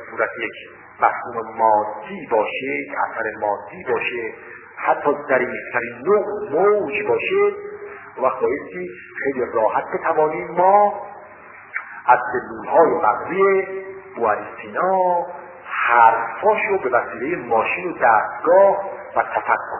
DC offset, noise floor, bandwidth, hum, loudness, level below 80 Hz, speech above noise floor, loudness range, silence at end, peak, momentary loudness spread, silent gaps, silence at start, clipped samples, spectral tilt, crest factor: under 0.1%; -41 dBFS; 3.2 kHz; none; -19 LUFS; -60 dBFS; 22 dB; 4 LU; 0 s; 0 dBFS; 16 LU; none; 0 s; under 0.1%; -8.5 dB/octave; 20 dB